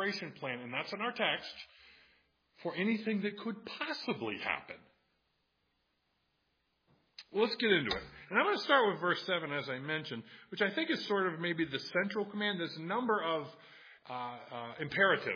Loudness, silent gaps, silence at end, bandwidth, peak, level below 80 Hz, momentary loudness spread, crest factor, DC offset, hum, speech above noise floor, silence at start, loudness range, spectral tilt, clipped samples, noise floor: -34 LUFS; none; 0 s; 5.4 kHz; -12 dBFS; -72 dBFS; 16 LU; 24 dB; under 0.1%; none; 44 dB; 0 s; 9 LU; -5.5 dB/octave; under 0.1%; -79 dBFS